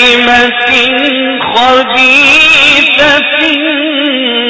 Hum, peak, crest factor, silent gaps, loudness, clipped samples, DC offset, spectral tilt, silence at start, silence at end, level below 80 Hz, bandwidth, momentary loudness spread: none; 0 dBFS; 8 dB; none; -5 LUFS; 2%; under 0.1%; -2 dB/octave; 0 s; 0 s; -40 dBFS; 8 kHz; 8 LU